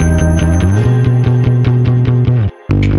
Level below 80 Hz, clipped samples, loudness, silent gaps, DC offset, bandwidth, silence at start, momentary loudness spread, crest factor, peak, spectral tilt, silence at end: -22 dBFS; under 0.1%; -12 LUFS; none; under 0.1%; 11.5 kHz; 0 s; 3 LU; 10 dB; 0 dBFS; -8 dB/octave; 0 s